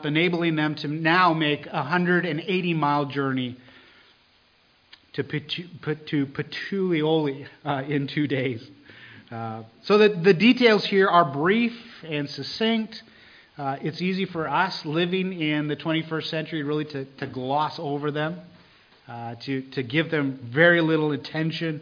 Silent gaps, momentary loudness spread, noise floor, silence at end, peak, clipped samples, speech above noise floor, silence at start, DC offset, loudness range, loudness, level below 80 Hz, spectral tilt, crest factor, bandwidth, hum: none; 15 LU; -61 dBFS; 0 s; -4 dBFS; under 0.1%; 37 dB; 0 s; under 0.1%; 9 LU; -24 LUFS; -68 dBFS; -7 dB/octave; 22 dB; 5.2 kHz; none